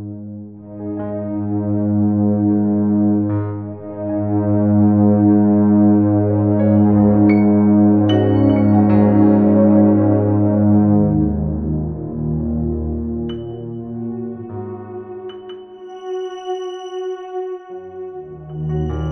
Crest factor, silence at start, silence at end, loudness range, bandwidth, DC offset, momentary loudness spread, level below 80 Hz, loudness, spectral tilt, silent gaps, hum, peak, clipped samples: 14 dB; 0 s; 0 s; 15 LU; 3.2 kHz; 0.5%; 19 LU; -36 dBFS; -16 LUFS; -10.5 dB/octave; none; none; -2 dBFS; under 0.1%